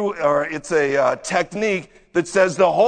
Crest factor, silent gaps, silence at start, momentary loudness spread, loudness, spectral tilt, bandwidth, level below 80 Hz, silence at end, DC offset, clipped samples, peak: 18 dB; none; 0 s; 7 LU; -20 LUFS; -4.5 dB/octave; 9.4 kHz; -56 dBFS; 0 s; under 0.1%; under 0.1%; -2 dBFS